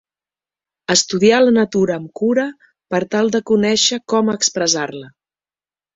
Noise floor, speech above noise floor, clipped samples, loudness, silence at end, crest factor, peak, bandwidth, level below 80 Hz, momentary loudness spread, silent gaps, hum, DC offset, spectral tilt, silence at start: under -90 dBFS; over 74 dB; under 0.1%; -16 LUFS; 0.9 s; 16 dB; 0 dBFS; 8 kHz; -58 dBFS; 10 LU; none; none; under 0.1%; -3 dB/octave; 0.9 s